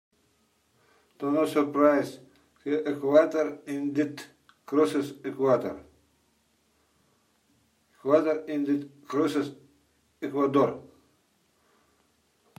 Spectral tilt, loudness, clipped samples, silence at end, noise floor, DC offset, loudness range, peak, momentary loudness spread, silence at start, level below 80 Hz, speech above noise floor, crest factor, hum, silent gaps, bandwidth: -6.5 dB/octave; -27 LUFS; under 0.1%; 1.7 s; -69 dBFS; under 0.1%; 5 LU; -8 dBFS; 15 LU; 1.2 s; -76 dBFS; 43 dB; 22 dB; none; none; 15 kHz